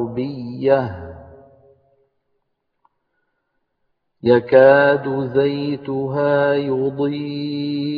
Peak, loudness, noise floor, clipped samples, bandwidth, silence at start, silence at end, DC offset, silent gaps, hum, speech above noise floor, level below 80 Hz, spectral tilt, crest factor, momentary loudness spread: 0 dBFS; -18 LUFS; -71 dBFS; under 0.1%; 5 kHz; 0 s; 0 s; under 0.1%; none; none; 54 dB; -56 dBFS; -9.5 dB/octave; 18 dB; 14 LU